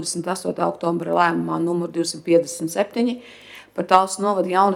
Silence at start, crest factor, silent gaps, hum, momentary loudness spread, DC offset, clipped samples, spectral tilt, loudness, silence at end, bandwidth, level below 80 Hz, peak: 0 s; 20 dB; none; none; 11 LU; under 0.1%; under 0.1%; -4.5 dB/octave; -21 LUFS; 0 s; 16 kHz; -64 dBFS; 0 dBFS